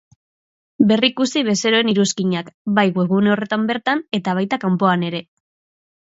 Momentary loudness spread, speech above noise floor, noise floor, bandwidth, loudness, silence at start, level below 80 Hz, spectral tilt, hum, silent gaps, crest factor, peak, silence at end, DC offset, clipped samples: 6 LU; over 72 dB; under -90 dBFS; 7.8 kHz; -18 LUFS; 0.8 s; -64 dBFS; -5 dB/octave; none; 2.54-2.65 s; 18 dB; 0 dBFS; 0.9 s; under 0.1%; under 0.1%